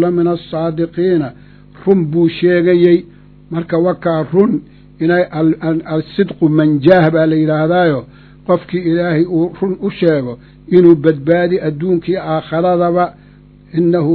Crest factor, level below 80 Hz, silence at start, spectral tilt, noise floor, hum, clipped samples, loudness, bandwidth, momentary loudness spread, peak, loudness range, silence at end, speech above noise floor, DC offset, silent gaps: 14 dB; -46 dBFS; 0 s; -11 dB/octave; -41 dBFS; 50 Hz at -40 dBFS; 0.2%; -14 LUFS; 4.9 kHz; 10 LU; 0 dBFS; 2 LU; 0 s; 28 dB; under 0.1%; none